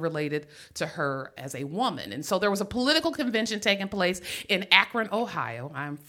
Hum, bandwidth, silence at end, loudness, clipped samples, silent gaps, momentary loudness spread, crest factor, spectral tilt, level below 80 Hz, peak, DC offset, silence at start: none; 17 kHz; 0.05 s; -27 LUFS; under 0.1%; none; 15 LU; 26 dB; -3.5 dB/octave; -60 dBFS; -2 dBFS; under 0.1%; 0 s